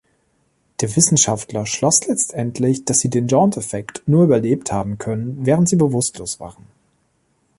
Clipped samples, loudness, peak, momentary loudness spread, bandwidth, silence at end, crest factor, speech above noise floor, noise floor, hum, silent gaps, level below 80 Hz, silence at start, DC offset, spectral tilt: under 0.1%; -17 LUFS; 0 dBFS; 11 LU; 11.5 kHz; 1.1 s; 18 dB; 46 dB; -64 dBFS; none; none; -50 dBFS; 0.8 s; under 0.1%; -5 dB/octave